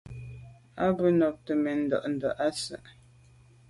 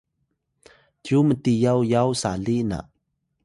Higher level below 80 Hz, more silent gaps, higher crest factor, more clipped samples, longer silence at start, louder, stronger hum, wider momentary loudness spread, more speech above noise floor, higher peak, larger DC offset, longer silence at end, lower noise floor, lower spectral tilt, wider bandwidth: second, -58 dBFS vs -50 dBFS; neither; about the same, 18 dB vs 16 dB; neither; second, 0.05 s vs 1.05 s; second, -28 LUFS vs -22 LUFS; neither; first, 21 LU vs 9 LU; second, 29 dB vs 54 dB; second, -12 dBFS vs -6 dBFS; neither; first, 0.8 s vs 0.65 s; second, -57 dBFS vs -74 dBFS; about the same, -6 dB/octave vs -6.5 dB/octave; about the same, 11.5 kHz vs 11.5 kHz